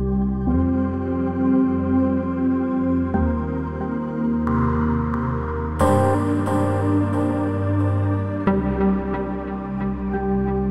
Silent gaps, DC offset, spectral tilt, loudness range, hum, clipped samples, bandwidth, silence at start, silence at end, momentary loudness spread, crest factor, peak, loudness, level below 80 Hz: none; under 0.1%; -9 dB/octave; 2 LU; none; under 0.1%; 12 kHz; 0 s; 0 s; 7 LU; 16 dB; -4 dBFS; -22 LUFS; -32 dBFS